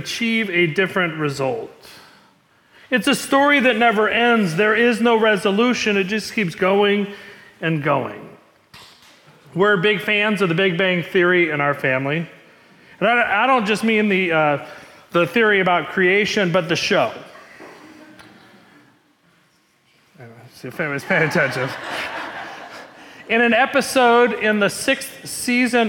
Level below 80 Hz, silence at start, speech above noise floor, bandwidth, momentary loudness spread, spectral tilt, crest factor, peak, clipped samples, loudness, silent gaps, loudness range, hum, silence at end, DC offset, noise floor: -62 dBFS; 0 s; 41 dB; 18 kHz; 12 LU; -4.5 dB/octave; 14 dB; -6 dBFS; under 0.1%; -18 LUFS; none; 7 LU; none; 0 s; under 0.1%; -59 dBFS